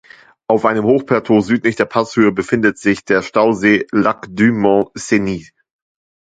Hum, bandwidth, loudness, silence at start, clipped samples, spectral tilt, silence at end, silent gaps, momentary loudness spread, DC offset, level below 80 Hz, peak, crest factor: none; 9.2 kHz; -15 LUFS; 0.5 s; under 0.1%; -6 dB/octave; 0.9 s; none; 5 LU; under 0.1%; -50 dBFS; 0 dBFS; 16 dB